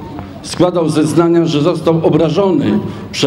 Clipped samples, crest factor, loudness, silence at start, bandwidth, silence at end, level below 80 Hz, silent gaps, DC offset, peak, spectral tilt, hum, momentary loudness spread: under 0.1%; 12 dB; -13 LUFS; 0 s; 12.5 kHz; 0 s; -44 dBFS; none; under 0.1%; 0 dBFS; -6.5 dB/octave; none; 11 LU